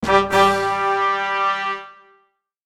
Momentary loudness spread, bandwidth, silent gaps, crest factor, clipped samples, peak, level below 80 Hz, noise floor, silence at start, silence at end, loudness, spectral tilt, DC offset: 9 LU; 16 kHz; none; 20 dB; under 0.1%; 0 dBFS; -50 dBFS; -63 dBFS; 0 s; 0.75 s; -18 LUFS; -4 dB/octave; under 0.1%